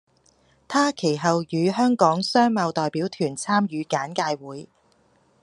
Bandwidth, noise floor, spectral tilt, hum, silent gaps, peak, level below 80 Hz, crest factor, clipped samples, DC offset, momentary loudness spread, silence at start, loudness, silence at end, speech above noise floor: 11.5 kHz; -62 dBFS; -5 dB/octave; none; none; -2 dBFS; -70 dBFS; 20 dB; under 0.1%; under 0.1%; 8 LU; 0.7 s; -23 LUFS; 0.75 s; 39 dB